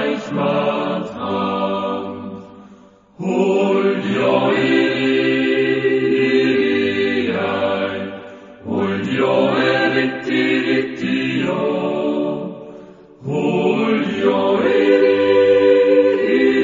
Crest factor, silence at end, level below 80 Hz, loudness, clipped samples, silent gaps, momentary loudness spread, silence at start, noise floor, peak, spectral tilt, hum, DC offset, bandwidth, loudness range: 16 dB; 0 s; -58 dBFS; -17 LUFS; under 0.1%; none; 12 LU; 0 s; -46 dBFS; -2 dBFS; -6.5 dB/octave; none; under 0.1%; 7.6 kHz; 5 LU